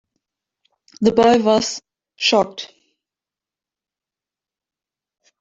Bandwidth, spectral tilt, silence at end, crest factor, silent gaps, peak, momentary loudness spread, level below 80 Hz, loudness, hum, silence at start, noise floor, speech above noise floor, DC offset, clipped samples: 7.8 kHz; -4 dB/octave; 2.75 s; 22 dB; none; 0 dBFS; 19 LU; -58 dBFS; -17 LUFS; 50 Hz at -60 dBFS; 1 s; -89 dBFS; 73 dB; under 0.1%; under 0.1%